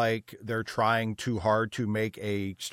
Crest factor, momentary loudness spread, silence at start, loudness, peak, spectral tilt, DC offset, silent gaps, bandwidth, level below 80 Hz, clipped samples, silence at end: 18 dB; 7 LU; 0 s; -29 LUFS; -12 dBFS; -5.5 dB/octave; under 0.1%; none; 16.5 kHz; -60 dBFS; under 0.1%; 0 s